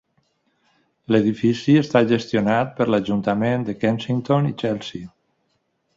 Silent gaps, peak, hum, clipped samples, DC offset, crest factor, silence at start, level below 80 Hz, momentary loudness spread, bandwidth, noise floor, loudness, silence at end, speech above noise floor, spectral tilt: none; -4 dBFS; none; under 0.1%; under 0.1%; 18 dB; 1.1 s; -56 dBFS; 8 LU; 7.8 kHz; -70 dBFS; -20 LUFS; 0.9 s; 50 dB; -7.5 dB/octave